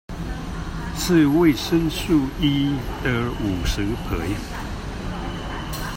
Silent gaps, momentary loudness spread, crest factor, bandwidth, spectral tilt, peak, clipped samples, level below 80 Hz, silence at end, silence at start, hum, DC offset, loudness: none; 13 LU; 16 dB; 16.5 kHz; -5.5 dB/octave; -6 dBFS; under 0.1%; -32 dBFS; 0 s; 0.1 s; none; under 0.1%; -23 LUFS